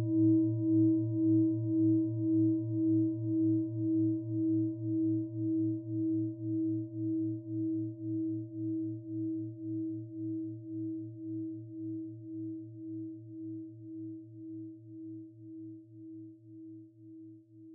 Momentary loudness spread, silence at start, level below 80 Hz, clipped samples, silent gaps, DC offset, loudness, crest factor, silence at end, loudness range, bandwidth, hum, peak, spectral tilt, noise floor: 20 LU; 0 s; -80 dBFS; under 0.1%; none; under 0.1%; -33 LUFS; 14 dB; 0 s; 17 LU; 1 kHz; none; -20 dBFS; -16 dB/octave; -53 dBFS